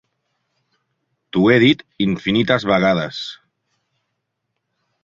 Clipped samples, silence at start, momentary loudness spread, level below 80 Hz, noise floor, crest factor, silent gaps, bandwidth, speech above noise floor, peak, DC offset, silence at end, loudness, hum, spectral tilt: under 0.1%; 1.35 s; 13 LU; -54 dBFS; -76 dBFS; 18 dB; none; 7.6 kHz; 59 dB; -2 dBFS; under 0.1%; 1.7 s; -17 LUFS; none; -6.5 dB/octave